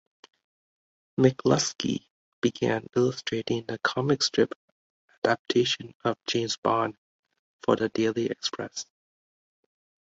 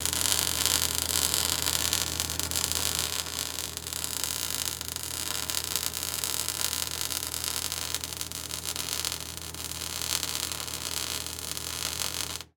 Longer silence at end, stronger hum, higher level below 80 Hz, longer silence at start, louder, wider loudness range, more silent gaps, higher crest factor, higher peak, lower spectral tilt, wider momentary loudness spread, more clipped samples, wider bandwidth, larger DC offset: first, 1.25 s vs 0.1 s; neither; second, -64 dBFS vs -52 dBFS; first, 1.2 s vs 0 s; about the same, -27 LUFS vs -28 LUFS; second, 2 LU vs 5 LU; first, 2.10-2.42 s, 4.56-5.08 s, 5.18-5.22 s, 5.39-5.45 s, 5.95-6.00 s, 6.58-6.63 s, 6.98-7.23 s, 7.39-7.59 s vs none; second, 22 dB vs 32 dB; second, -6 dBFS vs 0 dBFS; first, -4.5 dB/octave vs -0.5 dB/octave; about the same, 9 LU vs 8 LU; neither; second, 8 kHz vs over 20 kHz; neither